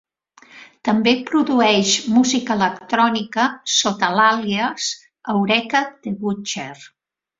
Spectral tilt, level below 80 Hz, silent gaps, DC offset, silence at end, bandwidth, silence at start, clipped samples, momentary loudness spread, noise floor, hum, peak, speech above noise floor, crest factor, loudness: -3 dB/octave; -62 dBFS; none; under 0.1%; 0.55 s; 7.8 kHz; 0.55 s; under 0.1%; 10 LU; -50 dBFS; none; -2 dBFS; 32 dB; 18 dB; -18 LUFS